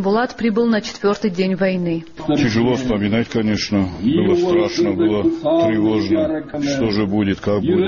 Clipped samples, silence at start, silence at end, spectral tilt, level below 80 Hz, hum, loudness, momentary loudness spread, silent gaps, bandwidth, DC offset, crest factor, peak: under 0.1%; 0 s; 0 s; -5.5 dB/octave; -44 dBFS; none; -18 LUFS; 4 LU; none; 7.2 kHz; 0.3%; 10 dB; -6 dBFS